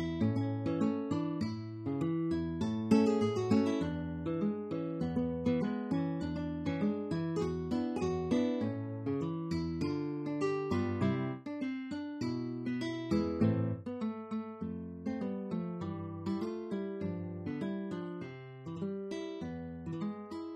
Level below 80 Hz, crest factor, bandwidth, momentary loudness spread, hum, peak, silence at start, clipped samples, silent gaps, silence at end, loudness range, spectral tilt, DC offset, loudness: -58 dBFS; 20 dB; 9.6 kHz; 9 LU; none; -14 dBFS; 0 s; under 0.1%; none; 0 s; 7 LU; -8 dB/octave; under 0.1%; -35 LUFS